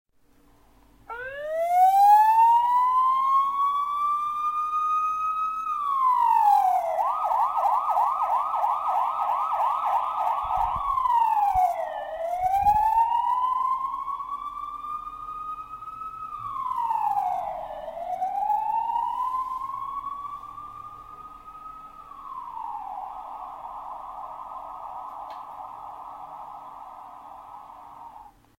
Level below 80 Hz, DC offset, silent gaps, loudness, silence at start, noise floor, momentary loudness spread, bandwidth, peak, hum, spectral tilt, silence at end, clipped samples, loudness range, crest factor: -54 dBFS; under 0.1%; none; -24 LUFS; 1.1 s; -59 dBFS; 21 LU; 16.5 kHz; -8 dBFS; none; -3.5 dB/octave; 0.3 s; under 0.1%; 18 LU; 18 dB